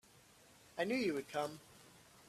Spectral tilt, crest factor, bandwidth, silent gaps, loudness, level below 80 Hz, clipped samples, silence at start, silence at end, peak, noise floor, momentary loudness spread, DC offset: -4.5 dB/octave; 20 dB; 15 kHz; none; -40 LUFS; -78 dBFS; under 0.1%; 0.75 s; 0.05 s; -24 dBFS; -65 dBFS; 24 LU; under 0.1%